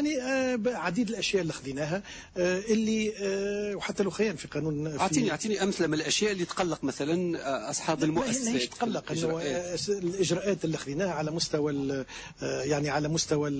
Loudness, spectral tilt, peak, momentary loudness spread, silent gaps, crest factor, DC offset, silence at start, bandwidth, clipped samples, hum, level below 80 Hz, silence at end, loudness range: -29 LUFS; -4.5 dB/octave; -14 dBFS; 6 LU; none; 14 dB; under 0.1%; 0 s; 8 kHz; under 0.1%; none; -58 dBFS; 0 s; 1 LU